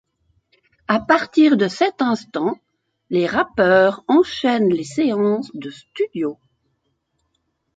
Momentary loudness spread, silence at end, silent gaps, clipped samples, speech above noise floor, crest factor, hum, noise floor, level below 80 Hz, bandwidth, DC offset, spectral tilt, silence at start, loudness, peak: 12 LU; 1.45 s; none; under 0.1%; 53 dB; 18 dB; none; -71 dBFS; -58 dBFS; 9 kHz; under 0.1%; -6 dB/octave; 0.9 s; -18 LUFS; -2 dBFS